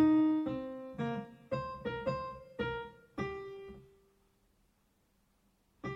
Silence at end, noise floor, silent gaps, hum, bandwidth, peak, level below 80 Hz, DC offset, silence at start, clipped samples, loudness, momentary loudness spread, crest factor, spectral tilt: 0 s; -74 dBFS; none; none; 6.2 kHz; -18 dBFS; -62 dBFS; under 0.1%; 0 s; under 0.1%; -37 LUFS; 16 LU; 18 dB; -8 dB/octave